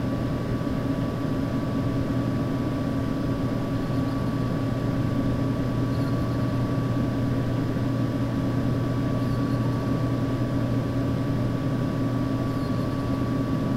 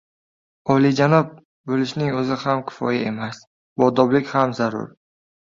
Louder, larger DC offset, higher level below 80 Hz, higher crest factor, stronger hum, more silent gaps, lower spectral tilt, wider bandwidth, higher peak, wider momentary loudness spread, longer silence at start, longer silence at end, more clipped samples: second, -26 LUFS vs -20 LUFS; neither; first, -40 dBFS vs -60 dBFS; second, 12 dB vs 18 dB; neither; second, none vs 1.45-1.64 s, 3.47-3.76 s; about the same, -8 dB/octave vs -7 dB/octave; first, 14 kHz vs 7.6 kHz; second, -14 dBFS vs -2 dBFS; second, 1 LU vs 16 LU; second, 0 s vs 0.65 s; second, 0 s vs 0.7 s; neither